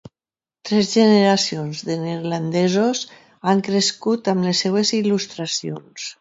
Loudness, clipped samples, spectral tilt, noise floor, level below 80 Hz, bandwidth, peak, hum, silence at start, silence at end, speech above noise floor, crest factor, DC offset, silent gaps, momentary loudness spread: -19 LUFS; under 0.1%; -4.5 dB/octave; under -90 dBFS; -64 dBFS; 8 kHz; -2 dBFS; none; 0.65 s; 0.1 s; over 71 dB; 18 dB; under 0.1%; none; 12 LU